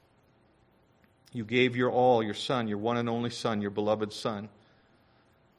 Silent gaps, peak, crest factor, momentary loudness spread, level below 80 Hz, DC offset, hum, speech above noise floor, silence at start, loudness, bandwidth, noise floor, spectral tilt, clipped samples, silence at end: none; -10 dBFS; 20 dB; 13 LU; -66 dBFS; under 0.1%; none; 36 dB; 1.35 s; -29 LUFS; 12 kHz; -65 dBFS; -5.5 dB/octave; under 0.1%; 1.1 s